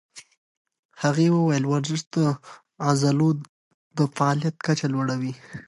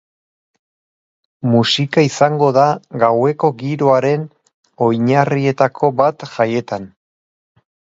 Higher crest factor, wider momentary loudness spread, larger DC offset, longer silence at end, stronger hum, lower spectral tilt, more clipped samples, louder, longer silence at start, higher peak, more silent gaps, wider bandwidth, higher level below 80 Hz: about the same, 16 dB vs 16 dB; about the same, 9 LU vs 8 LU; neither; second, 0.05 s vs 1.05 s; neither; about the same, -6 dB/octave vs -6 dB/octave; neither; second, -24 LUFS vs -15 LUFS; second, 0.15 s vs 1.45 s; second, -8 dBFS vs 0 dBFS; first, 0.37-0.65 s, 0.79-0.89 s, 2.07-2.11 s, 3.49-3.91 s vs 4.54-4.63 s; first, 11.5 kHz vs 7.8 kHz; second, -68 dBFS vs -60 dBFS